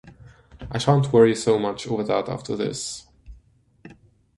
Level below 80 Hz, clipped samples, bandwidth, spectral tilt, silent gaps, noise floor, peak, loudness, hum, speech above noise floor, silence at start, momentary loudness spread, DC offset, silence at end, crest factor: -50 dBFS; under 0.1%; 11.5 kHz; -6 dB/octave; none; -57 dBFS; -4 dBFS; -22 LUFS; none; 36 dB; 0.05 s; 15 LU; under 0.1%; 0.45 s; 20 dB